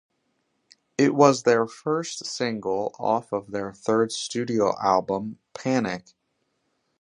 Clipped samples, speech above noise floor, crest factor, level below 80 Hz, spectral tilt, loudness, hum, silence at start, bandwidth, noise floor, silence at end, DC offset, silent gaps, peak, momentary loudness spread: under 0.1%; 50 dB; 22 dB; -66 dBFS; -5 dB/octave; -24 LUFS; none; 1 s; 11 kHz; -74 dBFS; 1 s; under 0.1%; none; -2 dBFS; 13 LU